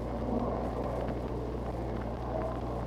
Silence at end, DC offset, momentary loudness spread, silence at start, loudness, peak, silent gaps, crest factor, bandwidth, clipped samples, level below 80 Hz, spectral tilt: 0 s; under 0.1%; 4 LU; 0 s; -35 LUFS; -20 dBFS; none; 12 dB; 12 kHz; under 0.1%; -40 dBFS; -8.5 dB/octave